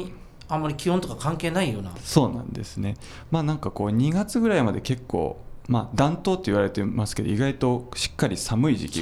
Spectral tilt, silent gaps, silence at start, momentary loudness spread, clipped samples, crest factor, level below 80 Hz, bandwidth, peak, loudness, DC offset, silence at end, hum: -6 dB/octave; none; 0 s; 9 LU; under 0.1%; 22 dB; -44 dBFS; 15 kHz; -2 dBFS; -25 LUFS; under 0.1%; 0 s; none